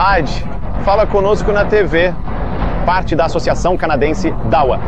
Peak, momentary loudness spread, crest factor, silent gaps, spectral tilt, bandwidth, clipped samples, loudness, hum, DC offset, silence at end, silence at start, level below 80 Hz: 0 dBFS; 8 LU; 14 dB; none; -6.5 dB/octave; 8.6 kHz; under 0.1%; -15 LUFS; none; 9%; 0 s; 0 s; -22 dBFS